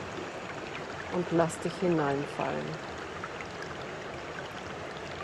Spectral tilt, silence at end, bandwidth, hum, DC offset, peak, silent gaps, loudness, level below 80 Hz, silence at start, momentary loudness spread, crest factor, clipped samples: -5.5 dB/octave; 0 s; 12.5 kHz; none; under 0.1%; -12 dBFS; none; -34 LUFS; -62 dBFS; 0 s; 11 LU; 22 dB; under 0.1%